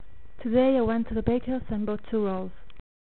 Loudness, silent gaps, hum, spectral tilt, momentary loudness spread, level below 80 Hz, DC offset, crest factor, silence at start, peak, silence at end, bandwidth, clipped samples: -27 LUFS; none; none; -7 dB/octave; 11 LU; -44 dBFS; 2%; 20 dB; 0.4 s; -8 dBFS; 0.6 s; 4.3 kHz; under 0.1%